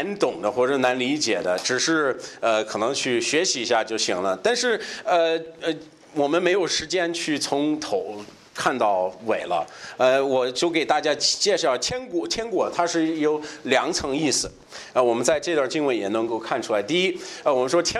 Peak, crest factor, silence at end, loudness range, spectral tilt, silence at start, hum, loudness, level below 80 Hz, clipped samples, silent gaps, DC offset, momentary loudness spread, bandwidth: -6 dBFS; 18 dB; 0 s; 2 LU; -2.5 dB/octave; 0 s; none; -23 LUFS; -58 dBFS; under 0.1%; none; under 0.1%; 7 LU; 13 kHz